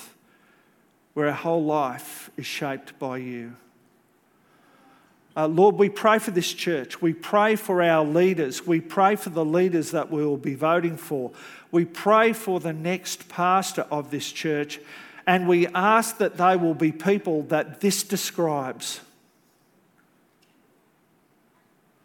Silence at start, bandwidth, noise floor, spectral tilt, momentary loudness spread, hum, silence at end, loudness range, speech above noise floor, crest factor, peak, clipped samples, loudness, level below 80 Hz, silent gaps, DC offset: 0 s; 17.5 kHz; -63 dBFS; -5 dB/octave; 13 LU; none; 3.05 s; 9 LU; 40 dB; 20 dB; -4 dBFS; under 0.1%; -23 LUFS; -76 dBFS; none; under 0.1%